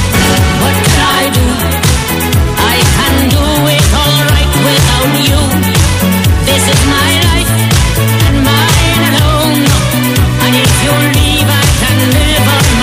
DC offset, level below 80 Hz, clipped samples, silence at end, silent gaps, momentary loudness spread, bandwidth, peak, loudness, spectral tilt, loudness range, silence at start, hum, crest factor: under 0.1%; -16 dBFS; under 0.1%; 0 s; none; 2 LU; 16 kHz; 0 dBFS; -8 LUFS; -4 dB/octave; 1 LU; 0 s; none; 8 dB